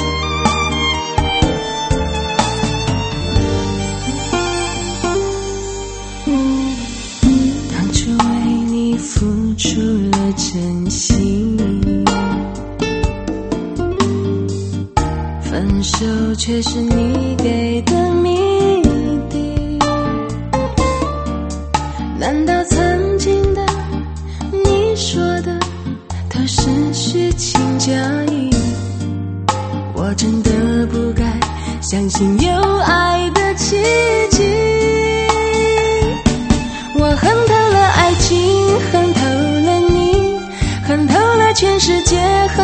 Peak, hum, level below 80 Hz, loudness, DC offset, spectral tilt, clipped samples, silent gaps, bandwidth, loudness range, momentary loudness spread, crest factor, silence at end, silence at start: 0 dBFS; none; -26 dBFS; -16 LUFS; under 0.1%; -5 dB/octave; under 0.1%; none; 8.8 kHz; 5 LU; 9 LU; 16 dB; 0 s; 0 s